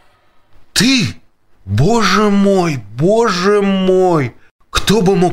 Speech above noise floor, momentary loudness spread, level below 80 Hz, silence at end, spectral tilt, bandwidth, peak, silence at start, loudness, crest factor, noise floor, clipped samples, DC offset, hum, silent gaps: 37 dB; 8 LU; -34 dBFS; 0 s; -5 dB/octave; 16 kHz; 0 dBFS; 0.55 s; -13 LUFS; 14 dB; -48 dBFS; under 0.1%; under 0.1%; none; 4.51-4.59 s